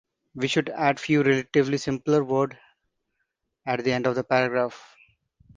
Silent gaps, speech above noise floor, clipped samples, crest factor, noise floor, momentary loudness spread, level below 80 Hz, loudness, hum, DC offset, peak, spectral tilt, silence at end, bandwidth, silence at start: none; 54 dB; under 0.1%; 20 dB; -78 dBFS; 9 LU; -62 dBFS; -24 LUFS; none; under 0.1%; -6 dBFS; -6 dB/octave; 0.75 s; 9.6 kHz; 0.35 s